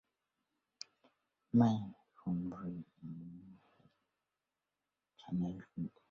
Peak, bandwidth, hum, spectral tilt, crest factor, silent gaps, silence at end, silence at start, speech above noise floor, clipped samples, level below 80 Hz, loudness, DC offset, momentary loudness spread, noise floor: -18 dBFS; 7 kHz; none; -8.5 dB/octave; 24 dB; none; 0.2 s; 1.55 s; over 54 dB; under 0.1%; -70 dBFS; -38 LUFS; under 0.1%; 22 LU; under -90 dBFS